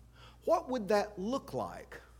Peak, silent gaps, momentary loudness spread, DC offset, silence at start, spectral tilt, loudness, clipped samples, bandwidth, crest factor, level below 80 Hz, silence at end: -16 dBFS; none; 10 LU; under 0.1%; 0.2 s; -5.5 dB/octave; -34 LUFS; under 0.1%; 17.5 kHz; 20 dB; -60 dBFS; 0 s